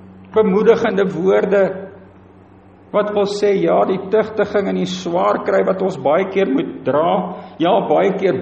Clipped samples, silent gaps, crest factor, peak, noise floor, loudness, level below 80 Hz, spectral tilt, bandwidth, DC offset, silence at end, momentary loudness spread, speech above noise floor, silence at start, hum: under 0.1%; none; 16 dB; 0 dBFS; -44 dBFS; -17 LUFS; -58 dBFS; -6.5 dB/octave; 8.2 kHz; under 0.1%; 0 s; 6 LU; 28 dB; 0 s; none